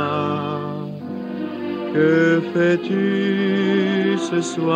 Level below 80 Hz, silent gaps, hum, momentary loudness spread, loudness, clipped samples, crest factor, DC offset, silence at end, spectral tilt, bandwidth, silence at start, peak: -74 dBFS; none; none; 11 LU; -20 LUFS; under 0.1%; 14 dB; under 0.1%; 0 s; -6.5 dB/octave; 9.4 kHz; 0 s; -6 dBFS